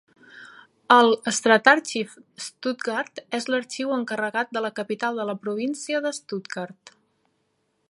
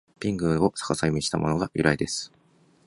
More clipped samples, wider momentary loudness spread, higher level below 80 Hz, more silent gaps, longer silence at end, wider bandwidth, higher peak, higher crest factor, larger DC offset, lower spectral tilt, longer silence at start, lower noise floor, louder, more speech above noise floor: neither; first, 16 LU vs 7 LU; second, -80 dBFS vs -48 dBFS; neither; first, 1.2 s vs 0.6 s; about the same, 11.5 kHz vs 11.5 kHz; first, 0 dBFS vs -4 dBFS; about the same, 24 dB vs 22 dB; neither; second, -3 dB/octave vs -5 dB/octave; first, 0.35 s vs 0.2 s; first, -72 dBFS vs -61 dBFS; about the same, -23 LUFS vs -25 LUFS; first, 48 dB vs 36 dB